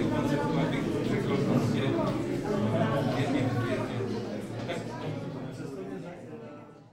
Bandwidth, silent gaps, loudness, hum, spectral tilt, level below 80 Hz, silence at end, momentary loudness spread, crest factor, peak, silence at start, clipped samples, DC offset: 15 kHz; none; -30 LUFS; none; -7 dB/octave; -54 dBFS; 0 s; 13 LU; 18 dB; -12 dBFS; 0 s; under 0.1%; under 0.1%